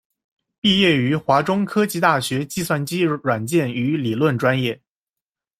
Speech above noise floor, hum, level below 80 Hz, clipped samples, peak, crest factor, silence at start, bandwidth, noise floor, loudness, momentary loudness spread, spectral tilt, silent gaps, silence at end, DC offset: 70 dB; none; -56 dBFS; under 0.1%; -2 dBFS; 18 dB; 0.65 s; 16 kHz; -89 dBFS; -19 LUFS; 7 LU; -5 dB/octave; none; 0.85 s; under 0.1%